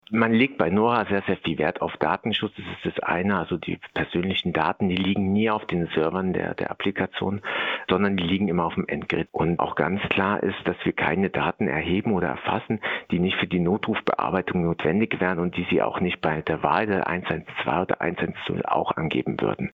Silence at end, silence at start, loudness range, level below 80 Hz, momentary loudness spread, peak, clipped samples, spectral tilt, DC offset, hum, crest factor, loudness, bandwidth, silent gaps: 0.05 s; 0.1 s; 1 LU; -56 dBFS; 5 LU; -4 dBFS; under 0.1%; -8.5 dB/octave; under 0.1%; none; 20 dB; -25 LUFS; 5 kHz; none